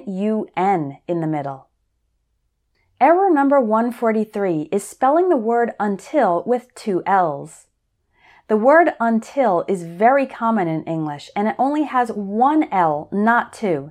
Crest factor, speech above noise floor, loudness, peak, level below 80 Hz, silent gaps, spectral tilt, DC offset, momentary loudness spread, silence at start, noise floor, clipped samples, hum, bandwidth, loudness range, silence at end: 18 dB; 51 dB; -19 LUFS; -2 dBFS; -66 dBFS; none; -7 dB/octave; under 0.1%; 9 LU; 0 s; -69 dBFS; under 0.1%; none; 14 kHz; 3 LU; 0 s